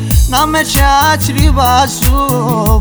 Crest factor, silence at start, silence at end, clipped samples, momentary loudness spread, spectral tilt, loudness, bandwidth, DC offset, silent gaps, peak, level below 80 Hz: 10 dB; 0 s; 0 s; under 0.1%; 3 LU; -4.5 dB/octave; -10 LUFS; over 20 kHz; under 0.1%; none; 0 dBFS; -14 dBFS